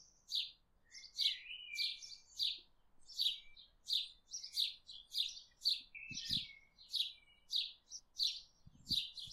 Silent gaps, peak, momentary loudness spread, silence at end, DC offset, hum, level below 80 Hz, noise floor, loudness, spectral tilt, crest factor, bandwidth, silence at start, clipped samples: none; -24 dBFS; 14 LU; 0 s; under 0.1%; none; -72 dBFS; -64 dBFS; -40 LUFS; 0.5 dB/octave; 20 dB; 15.5 kHz; 0 s; under 0.1%